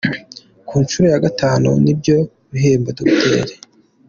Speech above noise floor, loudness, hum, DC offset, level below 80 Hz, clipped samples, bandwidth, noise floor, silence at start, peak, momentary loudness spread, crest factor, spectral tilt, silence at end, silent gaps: 26 dB; -15 LUFS; none; under 0.1%; -46 dBFS; under 0.1%; 7.4 kHz; -40 dBFS; 0.05 s; -2 dBFS; 9 LU; 14 dB; -6 dB/octave; 0.55 s; none